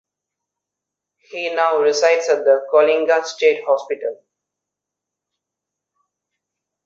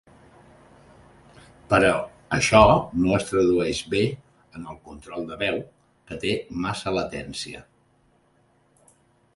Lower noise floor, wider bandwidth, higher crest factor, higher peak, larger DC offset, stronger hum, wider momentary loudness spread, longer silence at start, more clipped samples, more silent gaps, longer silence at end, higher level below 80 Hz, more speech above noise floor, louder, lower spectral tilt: first, -84 dBFS vs -63 dBFS; second, 7.8 kHz vs 11.5 kHz; second, 18 dB vs 24 dB; about the same, -2 dBFS vs 0 dBFS; neither; neither; second, 11 LU vs 22 LU; second, 1.35 s vs 1.7 s; neither; neither; first, 2.7 s vs 1.75 s; second, -74 dBFS vs -46 dBFS; first, 67 dB vs 40 dB; first, -17 LUFS vs -23 LUFS; second, -1.5 dB/octave vs -5 dB/octave